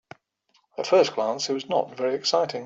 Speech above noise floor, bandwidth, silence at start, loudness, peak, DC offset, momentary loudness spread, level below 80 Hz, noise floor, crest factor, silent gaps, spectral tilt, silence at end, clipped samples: 44 dB; 8 kHz; 0.8 s; -24 LUFS; -8 dBFS; under 0.1%; 8 LU; -76 dBFS; -68 dBFS; 18 dB; none; -3.5 dB/octave; 0 s; under 0.1%